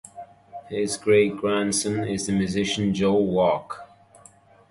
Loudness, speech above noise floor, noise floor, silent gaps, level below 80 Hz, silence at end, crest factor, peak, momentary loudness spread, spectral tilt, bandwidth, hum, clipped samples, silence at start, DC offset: -23 LUFS; 30 dB; -53 dBFS; none; -54 dBFS; 0.85 s; 16 dB; -8 dBFS; 20 LU; -4.5 dB/octave; 11.5 kHz; none; under 0.1%; 0.15 s; under 0.1%